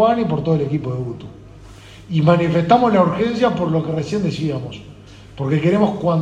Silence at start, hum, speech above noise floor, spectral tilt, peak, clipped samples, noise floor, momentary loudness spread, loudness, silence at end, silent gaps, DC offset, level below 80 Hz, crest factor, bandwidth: 0 s; none; 23 dB; -8 dB/octave; 0 dBFS; under 0.1%; -40 dBFS; 13 LU; -18 LUFS; 0 s; none; under 0.1%; -48 dBFS; 18 dB; 8.8 kHz